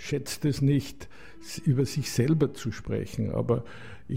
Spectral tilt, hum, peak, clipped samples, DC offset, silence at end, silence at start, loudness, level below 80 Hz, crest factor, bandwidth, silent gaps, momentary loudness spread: -6.5 dB/octave; none; -12 dBFS; under 0.1%; 0.6%; 0 s; 0 s; -28 LUFS; -52 dBFS; 16 dB; 16 kHz; none; 19 LU